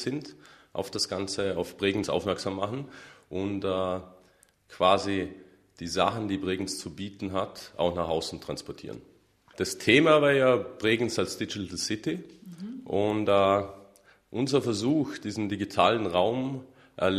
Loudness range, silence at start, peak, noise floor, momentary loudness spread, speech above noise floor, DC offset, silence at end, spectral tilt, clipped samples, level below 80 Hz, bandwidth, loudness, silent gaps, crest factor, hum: 6 LU; 0 s; -6 dBFS; -62 dBFS; 16 LU; 35 dB; under 0.1%; 0 s; -4.5 dB/octave; under 0.1%; -60 dBFS; 14 kHz; -28 LUFS; none; 24 dB; none